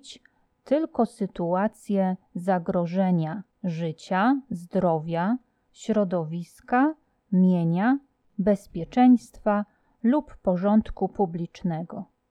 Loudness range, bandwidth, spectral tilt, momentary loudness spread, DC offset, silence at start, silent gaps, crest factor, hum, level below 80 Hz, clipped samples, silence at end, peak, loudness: 3 LU; 11 kHz; -8.5 dB/octave; 11 LU; under 0.1%; 0.05 s; none; 18 dB; none; -54 dBFS; under 0.1%; 0.25 s; -8 dBFS; -25 LUFS